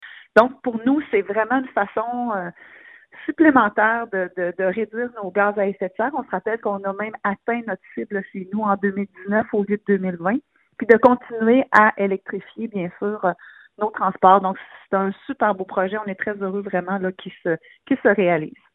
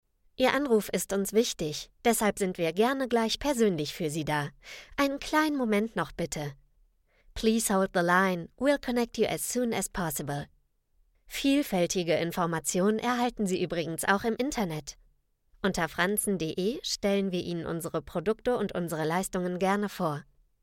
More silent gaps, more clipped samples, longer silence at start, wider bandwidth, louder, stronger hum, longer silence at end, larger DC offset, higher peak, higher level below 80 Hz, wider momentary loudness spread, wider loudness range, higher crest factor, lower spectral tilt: neither; neither; second, 0 s vs 0.4 s; second, 7.6 kHz vs 17 kHz; first, -21 LUFS vs -29 LUFS; neither; second, 0.25 s vs 0.4 s; neither; first, 0 dBFS vs -10 dBFS; second, -64 dBFS vs -54 dBFS; first, 13 LU vs 8 LU; first, 6 LU vs 3 LU; about the same, 20 dB vs 20 dB; first, -8.5 dB/octave vs -4.5 dB/octave